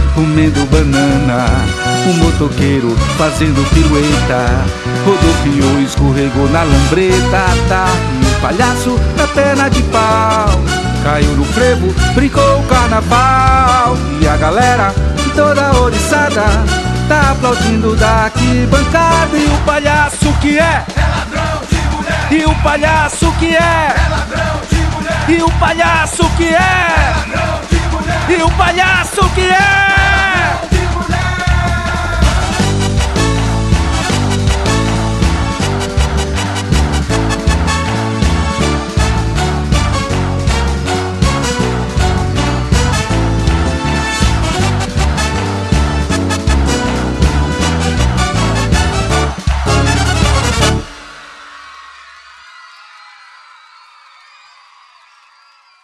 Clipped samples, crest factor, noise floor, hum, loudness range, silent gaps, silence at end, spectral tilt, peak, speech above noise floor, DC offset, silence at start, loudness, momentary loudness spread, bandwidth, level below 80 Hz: under 0.1%; 12 dB; -47 dBFS; none; 4 LU; none; 3.2 s; -5 dB/octave; 0 dBFS; 37 dB; under 0.1%; 0 s; -12 LUFS; 5 LU; 13 kHz; -18 dBFS